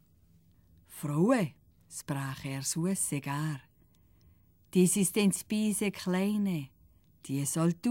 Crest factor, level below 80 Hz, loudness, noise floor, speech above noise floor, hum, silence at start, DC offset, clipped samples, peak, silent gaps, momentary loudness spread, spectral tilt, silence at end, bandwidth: 18 dB; -66 dBFS; -31 LUFS; -64 dBFS; 34 dB; none; 0.9 s; under 0.1%; under 0.1%; -14 dBFS; none; 15 LU; -5 dB/octave; 0 s; 17 kHz